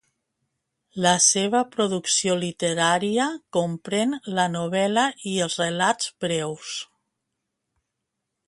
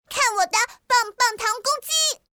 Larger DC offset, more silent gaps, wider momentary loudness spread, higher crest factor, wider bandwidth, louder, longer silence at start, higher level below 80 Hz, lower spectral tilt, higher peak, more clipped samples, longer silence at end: neither; neither; first, 10 LU vs 4 LU; first, 20 dB vs 14 dB; second, 11.5 kHz vs over 20 kHz; about the same, -23 LUFS vs -21 LUFS; first, 0.95 s vs 0.1 s; second, -68 dBFS vs -62 dBFS; first, -3 dB/octave vs 2.5 dB/octave; first, -4 dBFS vs -8 dBFS; neither; first, 1.65 s vs 0.2 s